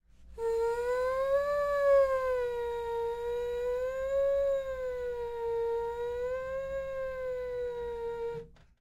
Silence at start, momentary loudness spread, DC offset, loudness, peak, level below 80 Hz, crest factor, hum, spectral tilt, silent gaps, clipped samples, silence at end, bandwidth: 0.2 s; 8 LU; under 0.1%; -32 LUFS; -18 dBFS; -54 dBFS; 14 dB; none; -4.5 dB/octave; none; under 0.1%; 0.3 s; 14 kHz